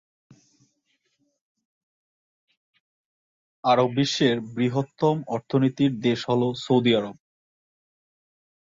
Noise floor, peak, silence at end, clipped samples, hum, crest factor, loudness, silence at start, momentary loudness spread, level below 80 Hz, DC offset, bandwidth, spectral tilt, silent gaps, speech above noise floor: -73 dBFS; -8 dBFS; 1.55 s; under 0.1%; none; 18 dB; -23 LUFS; 3.65 s; 5 LU; -66 dBFS; under 0.1%; 7.8 kHz; -6 dB/octave; none; 50 dB